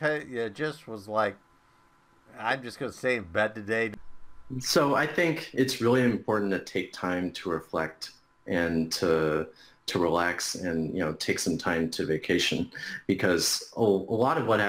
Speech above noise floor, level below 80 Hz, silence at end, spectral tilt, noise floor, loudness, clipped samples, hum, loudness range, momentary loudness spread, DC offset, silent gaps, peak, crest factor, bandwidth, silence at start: 34 dB; -58 dBFS; 0 s; -4 dB/octave; -62 dBFS; -28 LUFS; under 0.1%; none; 5 LU; 10 LU; under 0.1%; none; -12 dBFS; 16 dB; 16 kHz; 0 s